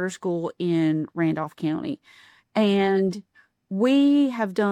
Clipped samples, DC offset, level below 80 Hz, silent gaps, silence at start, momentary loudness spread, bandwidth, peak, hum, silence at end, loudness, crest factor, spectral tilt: under 0.1%; under 0.1%; -70 dBFS; none; 0 s; 11 LU; 9.8 kHz; -10 dBFS; none; 0 s; -23 LUFS; 14 dB; -7 dB/octave